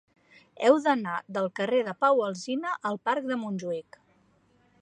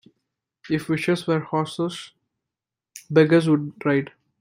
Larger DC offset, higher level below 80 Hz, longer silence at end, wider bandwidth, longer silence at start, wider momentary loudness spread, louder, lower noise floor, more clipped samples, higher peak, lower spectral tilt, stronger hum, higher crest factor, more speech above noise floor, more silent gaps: neither; second, -80 dBFS vs -66 dBFS; first, 1 s vs 0.35 s; second, 9.8 kHz vs 15.5 kHz; about the same, 0.6 s vs 0.65 s; about the same, 9 LU vs 11 LU; second, -27 LUFS vs -22 LUFS; second, -65 dBFS vs -87 dBFS; neither; second, -8 dBFS vs -4 dBFS; about the same, -5.5 dB/octave vs -6.5 dB/octave; neither; about the same, 22 dB vs 20 dB; second, 38 dB vs 66 dB; neither